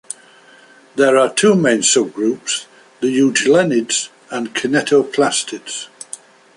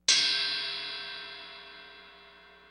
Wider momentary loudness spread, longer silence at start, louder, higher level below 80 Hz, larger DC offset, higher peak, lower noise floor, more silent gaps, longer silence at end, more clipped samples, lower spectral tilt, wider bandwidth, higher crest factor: second, 17 LU vs 25 LU; first, 0.95 s vs 0.1 s; first, -16 LUFS vs -28 LUFS; first, -64 dBFS vs -72 dBFS; neither; first, -2 dBFS vs -10 dBFS; second, -46 dBFS vs -55 dBFS; neither; first, 0.4 s vs 0.15 s; neither; first, -3 dB/octave vs 2 dB/octave; second, 11.5 kHz vs 15 kHz; second, 16 dB vs 24 dB